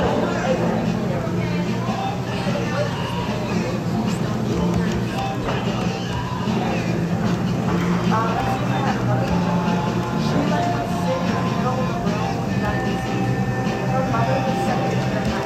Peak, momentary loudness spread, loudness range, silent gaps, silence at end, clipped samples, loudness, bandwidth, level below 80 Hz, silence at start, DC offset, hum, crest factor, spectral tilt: -8 dBFS; 3 LU; 2 LU; none; 0 s; under 0.1%; -22 LUFS; 14 kHz; -40 dBFS; 0 s; under 0.1%; none; 14 dB; -6.5 dB/octave